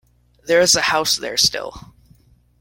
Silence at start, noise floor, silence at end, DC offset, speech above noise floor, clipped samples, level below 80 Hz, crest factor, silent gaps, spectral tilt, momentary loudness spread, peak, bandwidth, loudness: 0.45 s; -53 dBFS; 0.8 s; under 0.1%; 35 dB; under 0.1%; -50 dBFS; 20 dB; none; -1 dB/octave; 18 LU; -2 dBFS; 16.5 kHz; -16 LUFS